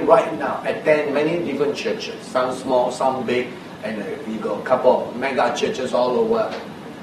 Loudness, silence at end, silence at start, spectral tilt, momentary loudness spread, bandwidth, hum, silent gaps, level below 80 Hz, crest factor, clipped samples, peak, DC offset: -21 LUFS; 0 s; 0 s; -5 dB/octave; 11 LU; 13 kHz; none; none; -60 dBFS; 20 dB; under 0.1%; 0 dBFS; under 0.1%